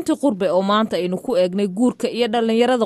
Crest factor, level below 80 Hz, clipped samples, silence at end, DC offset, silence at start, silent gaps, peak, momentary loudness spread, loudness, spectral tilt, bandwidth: 14 dB; -60 dBFS; under 0.1%; 0 s; under 0.1%; 0 s; none; -4 dBFS; 4 LU; -19 LUFS; -5.5 dB/octave; 12.5 kHz